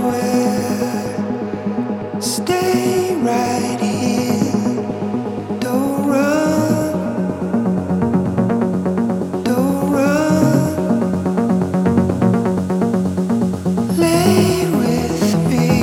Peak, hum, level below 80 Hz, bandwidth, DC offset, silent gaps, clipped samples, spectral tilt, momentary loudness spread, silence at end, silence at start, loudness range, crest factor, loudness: -2 dBFS; none; -46 dBFS; 17 kHz; under 0.1%; none; under 0.1%; -6.5 dB/octave; 7 LU; 0 s; 0 s; 3 LU; 14 dB; -17 LUFS